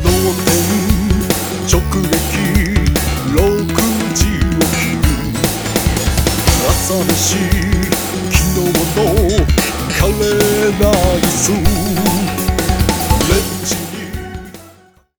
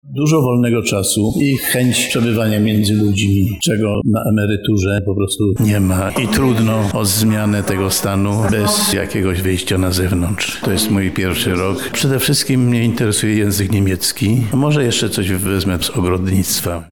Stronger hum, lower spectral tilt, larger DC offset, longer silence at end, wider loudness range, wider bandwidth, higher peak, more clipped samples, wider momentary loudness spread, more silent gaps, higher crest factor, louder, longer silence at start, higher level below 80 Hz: neither; about the same, -4.5 dB/octave vs -5 dB/octave; second, under 0.1% vs 1%; first, 0.5 s vs 0 s; about the same, 2 LU vs 1 LU; about the same, over 20 kHz vs 19.5 kHz; first, 0 dBFS vs -4 dBFS; neither; about the same, 4 LU vs 3 LU; neither; about the same, 14 dB vs 10 dB; about the same, -14 LUFS vs -15 LUFS; about the same, 0 s vs 0.05 s; first, -20 dBFS vs -38 dBFS